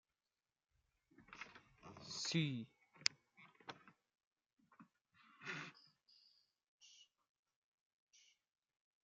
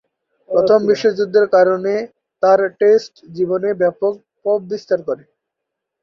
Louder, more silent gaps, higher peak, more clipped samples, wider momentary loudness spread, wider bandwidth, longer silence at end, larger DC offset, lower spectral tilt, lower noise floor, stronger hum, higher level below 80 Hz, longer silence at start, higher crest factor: second, -45 LUFS vs -16 LUFS; first, 4.27-4.31 s, 4.53-4.57 s, 5.01-5.05 s, 6.68-6.79 s, 7.29-7.43 s, 7.56-8.07 s vs none; second, -12 dBFS vs -2 dBFS; neither; first, 25 LU vs 10 LU; about the same, 7.4 kHz vs 7 kHz; about the same, 0.85 s vs 0.85 s; neither; second, -3.5 dB/octave vs -6 dB/octave; first, under -90 dBFS vs -80 dBFS; neither; second, -88 dBFS vs -64 dBFS; first, 1.2 s vs 0.5 s; first, 40 dB vs 14 dB